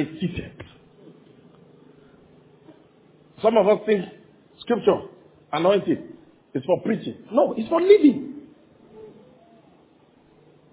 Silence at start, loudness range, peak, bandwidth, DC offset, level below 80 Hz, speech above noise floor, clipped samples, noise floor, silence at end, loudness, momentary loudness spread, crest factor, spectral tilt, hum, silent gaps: 0 s; 5 LU; -2 dBFS; 4 kHz; under 0.1%; -58 dBFS; 36 dB; under 0.1%; -56 dBFS; 1.65 s; -21 LUFS; 24 LU; 22 dB; -10.5 dB/octave; none; none